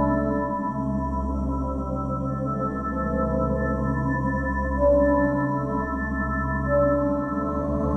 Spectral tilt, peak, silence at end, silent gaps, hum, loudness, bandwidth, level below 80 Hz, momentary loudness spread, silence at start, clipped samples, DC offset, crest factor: -10.5 dB/octave; -8 dBFS; 0 s; none; none; -25 LUFS; 8 kHz; -32 dBFS; 6 LU; 0 s; under 0.1%; under 0.1%; 16 dB